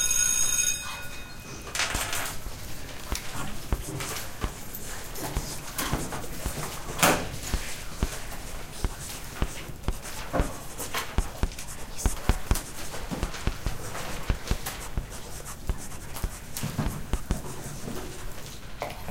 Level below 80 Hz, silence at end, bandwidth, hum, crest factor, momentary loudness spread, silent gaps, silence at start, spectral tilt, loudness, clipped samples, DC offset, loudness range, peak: -36 dBFS; 0 s; 17 kHz; none; 26 dB; 14 LU; none; 0 s; -3 dB/octave; -31 LUFS; under 0.1%; under 0.1%; 5 LU; -4 dBFS